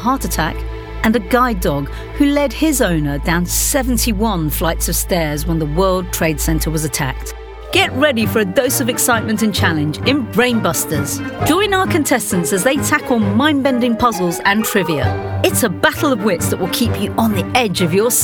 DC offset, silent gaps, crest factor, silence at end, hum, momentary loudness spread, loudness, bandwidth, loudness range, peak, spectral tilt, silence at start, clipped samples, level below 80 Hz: under 0.1%; none; 14 dB; 0 s; none; 5 LU; -16 LUFS; over 20 kHz; 2 LU; 0 dBFS; -4 dB/octave; 0 s; under 0.1%; -28 dBFS